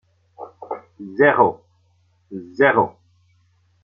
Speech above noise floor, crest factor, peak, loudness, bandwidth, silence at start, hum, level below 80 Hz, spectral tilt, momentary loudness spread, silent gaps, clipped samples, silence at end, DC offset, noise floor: 44 dB; 22 dB; 0 dBFS; -17 LUFS; 5.6 kHz; 0.4 s; none; -64 dBFS; -8 dB/octave; 25 LU; none; under 0.1%; 0.95 s; under 0.1%; -61 dBFS